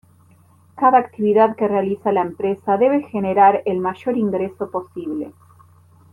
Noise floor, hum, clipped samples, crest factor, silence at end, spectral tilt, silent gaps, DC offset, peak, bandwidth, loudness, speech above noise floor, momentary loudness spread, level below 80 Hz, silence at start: -52 dBFS; none; under 0.1%; 16 dB; 0.8 s; -9 dB/octave; none; under 0.1%; -2 dBFS; 10 kHz; -19 LUFS; 34 dB; 13 LU; -66 dBFS; 0.75 s